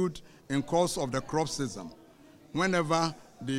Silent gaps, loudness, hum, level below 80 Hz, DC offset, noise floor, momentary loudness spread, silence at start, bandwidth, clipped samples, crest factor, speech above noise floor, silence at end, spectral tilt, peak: none; -30 LUFS; none; -56 dBFS; under 0.1%; -55 dBFS; 15 LU; 0 s; 16 kHz; under 0.1%; 18 dB; 25 dB; 0 s; -5 dB/octave; -12 dBFS